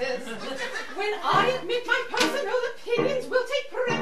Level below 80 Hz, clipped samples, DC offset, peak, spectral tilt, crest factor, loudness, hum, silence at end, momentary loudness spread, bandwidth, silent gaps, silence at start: -66 dBFS; under 0.1%; 1%; -8 dBFS; -3.5 dB/octave; 18 dB; -26 LUFS; none; 0 s; 9 LU; 14.5 kHz; none; 0 s